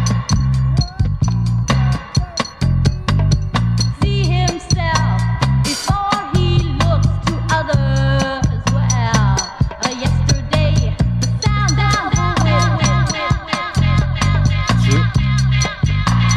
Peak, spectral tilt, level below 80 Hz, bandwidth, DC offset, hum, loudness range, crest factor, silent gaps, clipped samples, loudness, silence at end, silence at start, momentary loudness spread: 0 dBFS; -5 dB/octave; -24 dBFS; 12 kHz; under 0.1%; none; 2 LU; 14 dB; none; under 0.1%; -16 LUFS; 0 s; 0 s; 4 LU